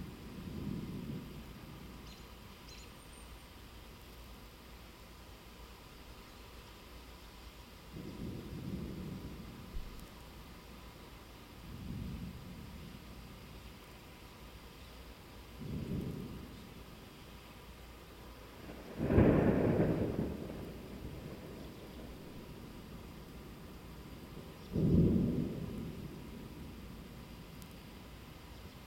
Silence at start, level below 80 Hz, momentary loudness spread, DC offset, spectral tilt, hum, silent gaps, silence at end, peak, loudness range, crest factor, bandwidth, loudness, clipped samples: 0 s; -52 dBFS; 20 LU; under 0.1%; -7.5 dB/octave; none; none; 0 s; -14 dBFS; 19 LU; 28 dB; 16.5 kHz; -39 LUFS; under 0.1%